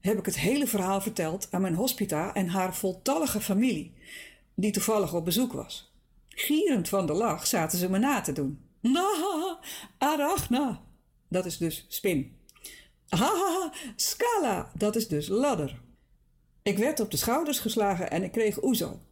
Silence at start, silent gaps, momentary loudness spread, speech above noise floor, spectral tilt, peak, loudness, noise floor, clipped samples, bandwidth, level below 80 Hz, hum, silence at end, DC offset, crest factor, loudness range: 0.05 s; none; 10 LU; 36 dB; -4.5 dB/octave; -16 dBFS; -28 LUFS; -64 dBFS; under 0.1%; 17 kHz; -56 dBFS; none; 0.15 s; under 0.1%; 12 dB; 3 LU